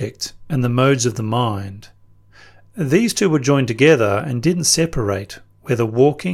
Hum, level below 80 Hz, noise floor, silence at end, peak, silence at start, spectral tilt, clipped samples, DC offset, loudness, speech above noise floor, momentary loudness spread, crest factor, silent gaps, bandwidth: none; -44 dBFS; -47 dBFS; 0 s; -2 dBFS; 0 s; -5 dB/octave; under 0.1%; under 0.1%; -17 LUFS; 30 dB; 14 LU; 16 dB; none; 16 kHz